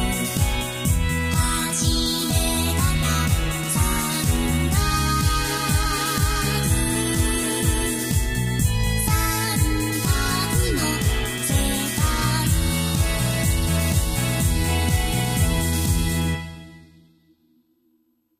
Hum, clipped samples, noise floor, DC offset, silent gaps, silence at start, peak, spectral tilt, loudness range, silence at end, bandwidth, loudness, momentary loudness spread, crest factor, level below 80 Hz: none; under 0.1%; -66 dBFS; under 0.1%; none; 0 s; -6 dBFS; -4 dB/octave; 1 LU; 1.55 s; 15.5 kHz; -21 LUFS; 2 LU; 16 dB; -28 dBFS